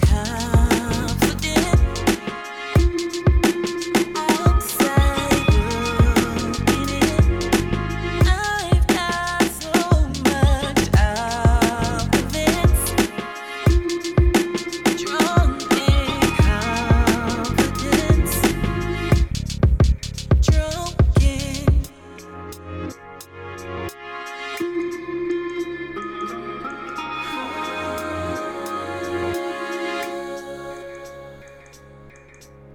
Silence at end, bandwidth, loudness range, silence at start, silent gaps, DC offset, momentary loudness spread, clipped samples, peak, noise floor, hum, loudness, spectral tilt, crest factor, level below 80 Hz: 0 s; 17.5 kHz; 9 LU; 0 s; none; under 0.1%; 13 LU; under 0.1%; -4 dBFS; -45 dBFS; none; -20 LUFS; -5.5 dB/octave; 16 dB; -24 dBFS